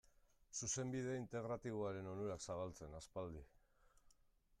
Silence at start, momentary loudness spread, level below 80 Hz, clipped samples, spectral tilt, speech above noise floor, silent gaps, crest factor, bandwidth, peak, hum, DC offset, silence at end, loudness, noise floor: 0.5 s; 9 LU; -68 dBFS; under 0.1%; -4.5 dB/octave; 28 dB; none; 16 dB; 14 kHz; -32 dBFS; none; under 0.1%; 0.45 s; -47 LUFS; -75 dBFS